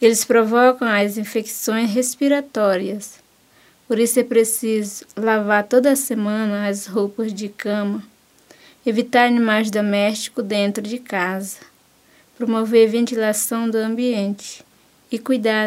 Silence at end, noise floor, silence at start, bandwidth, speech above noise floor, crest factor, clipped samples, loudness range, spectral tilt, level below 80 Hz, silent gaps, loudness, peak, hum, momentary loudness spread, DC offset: 0 s; -54 dBFS; 0 s; 16 kHz; 36 dB; 20 dB; under 0.1%; 3 LU; -4 dB/octave; -72 dBFS; none; -19 LUFS; 0 dBFS; none; 12 LU; under 0.1%